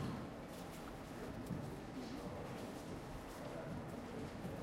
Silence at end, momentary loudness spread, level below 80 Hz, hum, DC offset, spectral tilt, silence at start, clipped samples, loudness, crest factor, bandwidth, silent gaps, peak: 0 s; 4 LU; -60 dBFS; none; under 0.1%; -6 dB/octave; 0 s; under 0.1%; -48 LUFS; 16 dB; 16 kHz; none; -32 dBFS